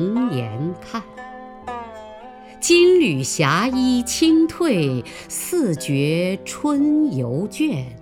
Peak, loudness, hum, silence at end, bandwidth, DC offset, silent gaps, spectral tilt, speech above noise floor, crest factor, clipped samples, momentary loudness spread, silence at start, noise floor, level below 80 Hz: -2 dBFS; -19 LUFS; none; 0 s; 18 kHz; under 0.1%; none; -5 dB/octave; 21 dB; 18 dB; under 0.1%; 19 LU; 0 s; -39 dBFS; -50 dBFS